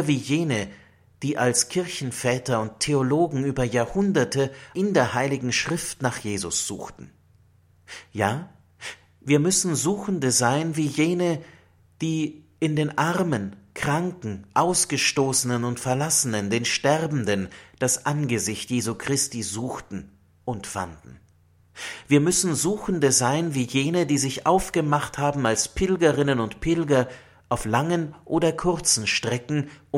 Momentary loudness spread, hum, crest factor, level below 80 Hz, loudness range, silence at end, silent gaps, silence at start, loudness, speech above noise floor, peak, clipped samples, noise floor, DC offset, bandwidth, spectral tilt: 12 LU; none; 20 dB; -50 dBFS; 5 LU; 0 s; none; 0 s; -23 LUFS; 35 dB; -4 dBFS; under 0.1%; -59 dBFS; under 0.1%; 16.5 kHz; -4 dB/octave